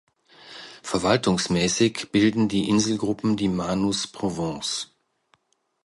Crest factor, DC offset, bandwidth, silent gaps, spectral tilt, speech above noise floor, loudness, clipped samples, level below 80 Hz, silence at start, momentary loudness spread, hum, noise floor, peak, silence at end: 18 dB; under 0.1%; 11.5 kHz; none; -4.5 dB/octave; 44 dB; -23 LUFS; under 0.1%; -52 dBFS; 0.45 s; 12 LU; none; -66 dBFS; -6 dBFS; 1 s